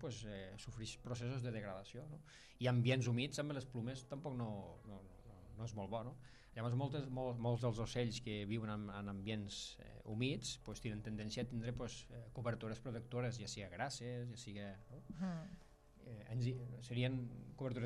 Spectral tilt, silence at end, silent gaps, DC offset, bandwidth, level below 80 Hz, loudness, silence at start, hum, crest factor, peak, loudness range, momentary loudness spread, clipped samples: -6 dB/octave; 0 s; none; under 0.1%; 12 kHz; -64 dBFS; -45 LUFS; 0 s; none; 20 dB; -24 dBFS; 5 LU; 15 LU; under 0.1%